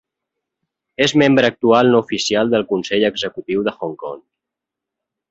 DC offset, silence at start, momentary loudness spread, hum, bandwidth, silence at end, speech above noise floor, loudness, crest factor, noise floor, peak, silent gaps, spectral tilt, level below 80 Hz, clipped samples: under 0.1%; 1 s; 16 LU; none; 8 kHz; 1.1 s; 67 dB; -16 LUFS; 18 dB; -84 dBFS; 0 dBFS; none; -4.5 dB/octave; -56 dBFS; under 0.1%